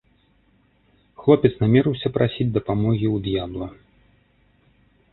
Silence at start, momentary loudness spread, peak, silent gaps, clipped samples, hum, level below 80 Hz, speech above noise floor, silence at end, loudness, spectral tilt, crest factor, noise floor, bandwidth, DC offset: 1.2 s; 11 LU; -2 dBFS; none; under 0.1%; none; -48 dBFS; 41 dB; 1.4 s; -21 LUFS; -12 dB/octave; 22 dB; -61 dBFS; 4.2 kHz; under 0.1%